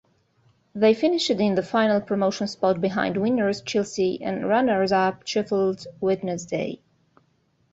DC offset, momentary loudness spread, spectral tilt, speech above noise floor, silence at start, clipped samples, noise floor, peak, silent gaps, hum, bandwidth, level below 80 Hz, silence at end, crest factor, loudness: under 0.1%; 7 LU; -5.5 dB/octave; 43 dB; 0.75 s; under 0.1%; -66 dBFS; -6 dBFS; none; none; 8 kHz; -62 dBFS; 0.95 s; 16 dB; -23 LUFS